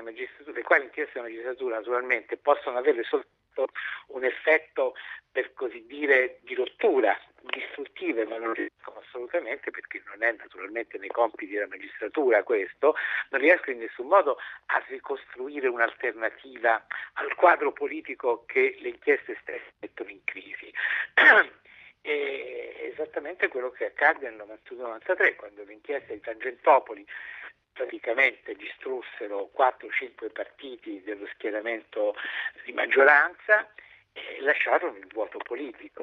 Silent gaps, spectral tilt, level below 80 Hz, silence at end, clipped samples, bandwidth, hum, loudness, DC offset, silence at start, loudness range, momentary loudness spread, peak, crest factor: none; -4 dB/octave; -76 dBFS; 0 s; under 0.1%; 6.4 kHz; none; -26 LUFS; under 0.1%; 0 s; 7 LU; 17 LU; -4 dBFS; 24 dB